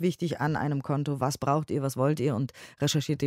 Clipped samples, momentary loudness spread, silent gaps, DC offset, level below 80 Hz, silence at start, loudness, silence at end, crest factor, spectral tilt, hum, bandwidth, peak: under 0.1%; 4 LU; none; under 0.1%; -62 dBFS; 0 s; -29 LUFS; 0 s; 16 dB; -6 dB/octave; none; 16 kHz; -12 dBFS